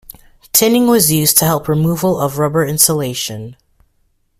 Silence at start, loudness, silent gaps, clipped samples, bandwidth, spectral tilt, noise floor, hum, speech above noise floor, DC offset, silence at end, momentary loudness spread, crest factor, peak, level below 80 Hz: 0.55 s; -13 LUFS; none; under 0.1%; over 20 kHz; -4 dB/octave; -60 dBFS; none; 46 dB; under 0.1%; 0.85 s; 11 LU; 16 dB; 0 dBFS; -46 dBFS